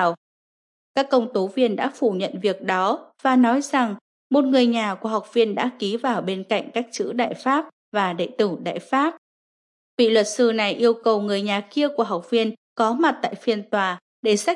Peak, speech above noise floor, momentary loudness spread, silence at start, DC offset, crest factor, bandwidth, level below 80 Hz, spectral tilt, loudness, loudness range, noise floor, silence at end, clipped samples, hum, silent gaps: -6 dBFS; over 69 dB; 8 LU; 0 s; under 0.1%; 16 dB; 11.5 kHz; -80 dBFS; -4.5 dB/octave; -22 LUFS; 3 LU; under -90 dBFS; 0 s; under 0.1%; none; 0.17-0.95 s, 4.01-4.30 s, 7.73-7.92 s, 9.18-9.98 s, 12.57-12.76 s, 14.01-14.23 s